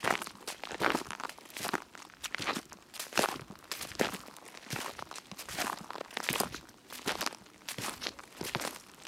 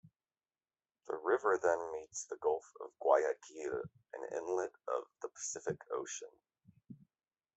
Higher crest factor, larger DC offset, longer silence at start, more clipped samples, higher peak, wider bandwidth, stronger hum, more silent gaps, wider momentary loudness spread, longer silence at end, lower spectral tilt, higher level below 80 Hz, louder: first, 30 dB vs 24 dB; neither; second, 0 s vs 1.05 s; neither; first, -8 dBFS vs -16 dBFS; first, over 20 kHz vs 8.2 kHz; neither; neither; about the same, 13 LU vs 14 LU; second, 0 s vs 0.6 s; second, -2 dB/octave vs -3.5 dB/octave; first, -66 dBFS vs -80 dBFS; about the same, -37 LUFS vs -38 LUFS